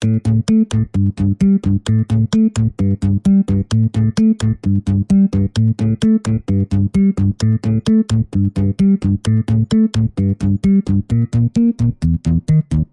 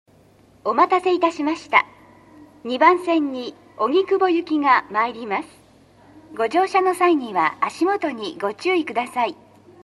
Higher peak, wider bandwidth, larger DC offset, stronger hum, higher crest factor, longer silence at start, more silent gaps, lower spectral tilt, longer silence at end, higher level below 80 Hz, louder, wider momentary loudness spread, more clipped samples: second, -4 dBFS vs 0 dBFS; second, 11 kHz vs 12.5 kHz; neither; neither; second, 10 dB vs 22 dB; second, 0 s vs 0.65 s; neither; first, -8 dB/octave vs -4 dB/octave; second, 0.1 s vs 0.55 s; first, -34 dBFS vs -66 dBFS; first, -16 LUFS vs -20 LUFS; second, 3 LU vs 10 LU; neither